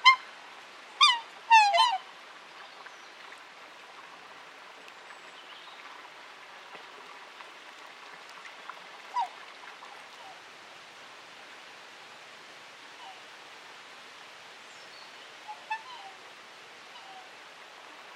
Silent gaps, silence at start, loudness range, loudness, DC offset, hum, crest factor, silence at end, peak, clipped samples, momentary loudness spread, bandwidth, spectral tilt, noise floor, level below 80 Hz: none; 0 s; 21 LU; -25 LUFS; under 0.1%; none; 28 dB; 0 s; -6 dBFS; under 0.1%; 24 LU; 14 kHz; 1.5 dB/octave; -50 dBFS; under -90 dBFS